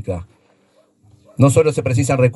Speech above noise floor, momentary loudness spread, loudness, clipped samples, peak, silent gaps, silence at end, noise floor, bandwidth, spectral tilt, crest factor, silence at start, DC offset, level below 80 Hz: 42 dB; 16 LU; -16 LUFS; under 0.1%; 0 dBFS; none; 0 s; -57 dBFS; 12 kHz; -7 dB/octave; 18 dB; 0.05 s; under 0.1%; -46 dBFS